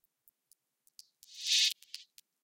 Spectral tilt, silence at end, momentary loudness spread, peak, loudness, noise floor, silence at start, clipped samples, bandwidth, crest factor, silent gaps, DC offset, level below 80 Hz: 8.5 dB/octave; 0.4 s; 22 LU; -14 dBFS; -29 LUFS; -73 dBFS; 1.3 s; under 0.1%; 17 kHz; 24 dB; none; under 0.1%; under -90 dBFS